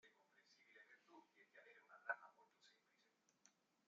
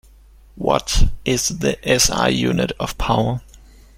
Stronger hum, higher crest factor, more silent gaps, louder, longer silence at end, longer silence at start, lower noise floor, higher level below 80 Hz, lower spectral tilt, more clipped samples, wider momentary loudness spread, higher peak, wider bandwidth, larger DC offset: neither; first, 30 dB vs 18 dB; neither; second, -52 LUFS vs -19 LUFS; about the same, 0.35 s vs 0.4 s; second, 0.05 s vs 0.55 s; first, -83 dBFS vs -46 dBFS; second, under -90 dBFS vs -26 dBFS; second, 1 dB/octave vs -3.5 dB/octave; neither; first, 18 LU vs 8 LU; second, -32 dBFS vs -2 dBFS; second, 7.2 kHz vs 16.5 kHz; neither